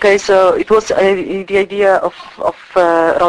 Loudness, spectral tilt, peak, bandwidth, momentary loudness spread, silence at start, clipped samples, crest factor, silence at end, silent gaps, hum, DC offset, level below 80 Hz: -13 LUFS; -4.5 dB/octave; 0 dBFS; 11 kHz; 10 LU; 0 s; under 0.1%; 12 dB; 0 s; none; none; under 0.1%; -46 dBFS